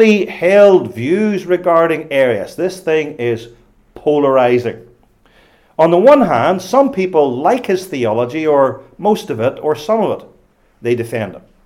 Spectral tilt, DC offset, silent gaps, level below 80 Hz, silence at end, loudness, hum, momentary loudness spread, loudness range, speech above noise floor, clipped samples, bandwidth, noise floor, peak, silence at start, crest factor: -6.5 dB/octave; under 0.1%; none; -54 dBFS; 0.25 s; -14 LUFS; none; 11 LU; 4 LU; 39 dB; under 0.1%; 15.5 kHz; -52 dBFS; 0 dBFS; 0 s; 14 dB